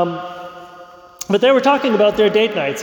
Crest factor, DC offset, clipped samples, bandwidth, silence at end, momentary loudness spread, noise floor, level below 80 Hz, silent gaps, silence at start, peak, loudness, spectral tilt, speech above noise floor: 14 dB; under 0.1%; under 0.1%; 19 kHz; 0 s; 19 LU; -40 dBFS; -54 dBFS; none; 0 s; -4 dBFS; -15 LUFS; -4.5 dB/octave; 25 dB